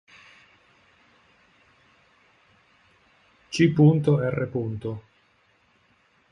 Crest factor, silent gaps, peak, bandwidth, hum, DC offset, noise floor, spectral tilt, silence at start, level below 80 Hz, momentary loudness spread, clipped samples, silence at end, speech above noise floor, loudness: 22 dB; none; -6 dBFS; 10.5 kHz; none; under 0.1%; -64 dBFS; -7.5 dB/octave; 3.5 s; -60 dBFS; 16 LU; under 0.1%; 1.3 s; 42 dB; -23 LUFS